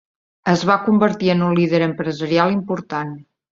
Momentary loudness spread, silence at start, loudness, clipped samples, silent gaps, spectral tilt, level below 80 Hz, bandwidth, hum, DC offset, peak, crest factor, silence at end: 10 LU; 0.45 s; -18 LUFS; under 0.1%; none; -7 dB/octave; -58 dBFS; 7.4 kHz; none; under 0.1%; -2 dBFS; 16 dB; 0.3 s